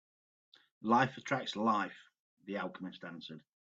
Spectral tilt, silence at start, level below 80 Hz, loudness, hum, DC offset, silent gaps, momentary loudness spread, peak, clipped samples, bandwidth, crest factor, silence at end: -5.5 dB/octave; 0.8 s; -82 dBFS; -35 LUFS; none; under 0.1%; 2.19-2.37 s; 21 LU; -16 dBFS; under 0.1%; 7.8 kHz; 22 dB; 0.3 s